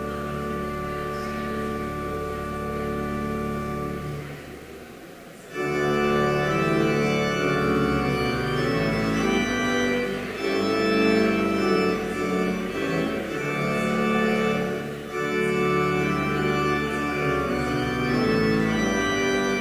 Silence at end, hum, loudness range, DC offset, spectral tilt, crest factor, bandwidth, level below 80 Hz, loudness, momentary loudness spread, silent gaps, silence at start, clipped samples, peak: 0 s; none; 6 LU; under 0.1%; -5.5 dB/octave; 16 dB; 16 kHz; -44 dBFS; -24 LUFS; 8 LU; none; 0 s; under 0.1%; -8 dBFS